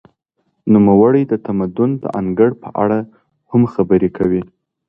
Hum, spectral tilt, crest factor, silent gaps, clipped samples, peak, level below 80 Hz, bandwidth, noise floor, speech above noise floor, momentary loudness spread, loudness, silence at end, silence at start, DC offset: none; -11.5 dB/octave; 16 dB; none; under 0.1%; 0 dBFS; -48 dBFS; 3.5 kHz; -67 dBFS; 53 dB; 10 LU; -15 LUFS; 0.45 s; 0.65 s; under 0.1%